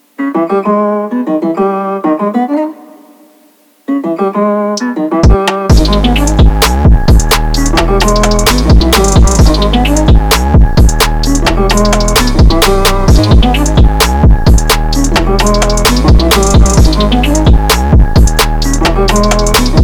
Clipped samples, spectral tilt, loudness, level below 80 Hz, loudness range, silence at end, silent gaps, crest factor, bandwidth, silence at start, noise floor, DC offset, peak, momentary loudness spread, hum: under 0.1%; -5 dB/octave; -9 LUFS; -10 dBFS; 6 LU; 0 s; none; 8 dB; over 20 kHz; 0.2 s; -46 dBFS; under 0.1%; 0 dBFS; 6 LU; none